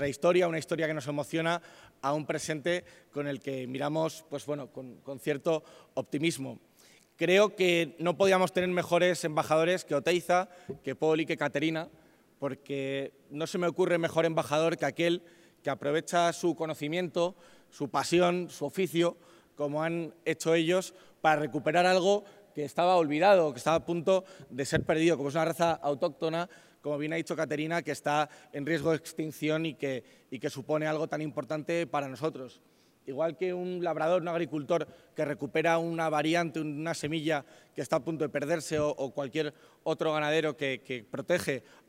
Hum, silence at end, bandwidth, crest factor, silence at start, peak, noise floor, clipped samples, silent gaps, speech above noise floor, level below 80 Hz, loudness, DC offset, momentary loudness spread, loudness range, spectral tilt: none; 0.3 s; 16 kHz; 20 dB; 0 s; -10 dBFS; -61 dBFS; under 0.1%; none; 31 dB; -68 dBFS; -30 LUFS; under 0.1%; 12 LU; 7 LU; -5 dB/octave